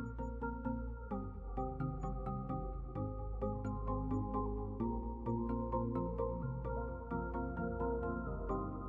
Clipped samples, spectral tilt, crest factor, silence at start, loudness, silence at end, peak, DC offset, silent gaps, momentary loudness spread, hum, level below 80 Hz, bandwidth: under 0.1%; -11 dB/octave; 14 dB; 0 s; -41 LUFS; 0 s; -24 dBFS; under 0.1%; none; 5 LU; none; -46 dBFS; 7.2 kHz